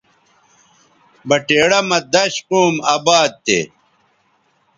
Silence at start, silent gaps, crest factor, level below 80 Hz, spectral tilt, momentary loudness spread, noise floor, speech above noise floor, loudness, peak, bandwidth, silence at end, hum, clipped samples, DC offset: 1.25 s; none; 18 dB; -60 dBFS; -3 dB/octave; 6 LU; -60 dBFS; 45 dB; -15 LUFS; 0 dBFS; 10.5 kHz; 1.1 s; none; under 0.1%; under 0.1%